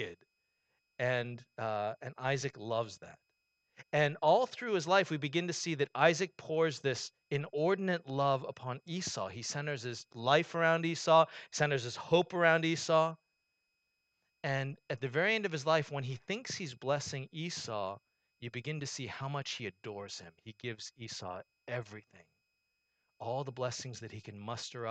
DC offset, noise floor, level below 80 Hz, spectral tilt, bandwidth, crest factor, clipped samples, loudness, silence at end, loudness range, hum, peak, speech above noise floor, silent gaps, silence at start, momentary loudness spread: under 0.1%; -83 dBFS; -76 dBFS; -4.5 dB/octave; 9 kHz; 24 dB; under 0.1%; -34 LUFS; 0 s; 12 LU; none; -12 dBFS; 48 dB; none; 0 s; 15 LU